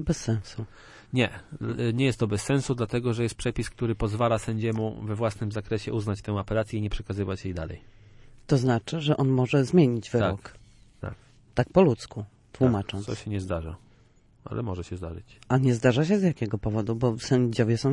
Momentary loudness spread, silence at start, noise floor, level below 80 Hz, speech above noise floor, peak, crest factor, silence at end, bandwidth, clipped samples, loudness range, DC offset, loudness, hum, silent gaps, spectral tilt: 15 LU; 0 s; -58 dBFS; -46 dBFS; 32 dB; -6 dBFS; 20 dB; 0 s; 11.5 kHz; under 0.1%; 5 LU; under 0.1%; -27 LUFS; none; none; -7 dB/octave